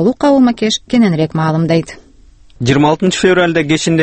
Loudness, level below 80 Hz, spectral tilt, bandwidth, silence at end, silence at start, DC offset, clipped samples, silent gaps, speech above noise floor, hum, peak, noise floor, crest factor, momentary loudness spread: -12 LUFS; -42 dBFS; -5.5 dB/octave; 8.8 kHz; 0 s; 0 s; under 0.1%; under 0.1%; none; 30 dB; none; 0 dBFS; -42 dBFS; 12 dB; 5 LU